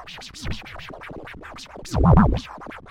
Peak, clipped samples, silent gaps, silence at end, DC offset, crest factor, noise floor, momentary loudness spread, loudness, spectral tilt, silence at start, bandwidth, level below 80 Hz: -6 dBFS; under 0.1%; none; 0.1 s; under 0.1%; 18 dB; -39 dBFS; 22 LU; -20 LUFS; -7 dB/octave; 0 s; 12.5 kHz; -28 dBFS